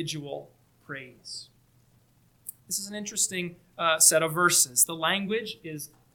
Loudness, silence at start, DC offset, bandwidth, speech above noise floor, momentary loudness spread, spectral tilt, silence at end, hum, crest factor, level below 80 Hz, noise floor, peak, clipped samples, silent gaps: -24 LUFS; 0 s; under 0.1%; 19 kHz; 36 dB; 22 LU; -1.5 dB/octave; 0.3 s; none; 24 dB; -70 dBFS; -63 dBFS; -4 dBFS; under 0.1%; none